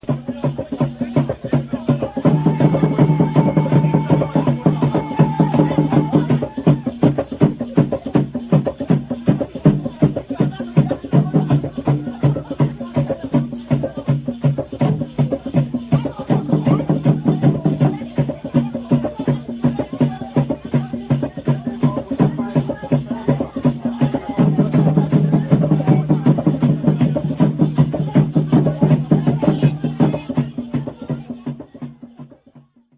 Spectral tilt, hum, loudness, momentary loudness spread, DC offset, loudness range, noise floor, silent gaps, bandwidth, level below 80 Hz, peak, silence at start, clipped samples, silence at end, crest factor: -13 dB/octave; none; -18 LUFS; 7 LU; under 0.1%; 4 LU; -48 dBFS; none; 4 kHz; -44 dBFS; 0 dBFS; 0.05 s; under 0.1%; 0.4 s; 16 dB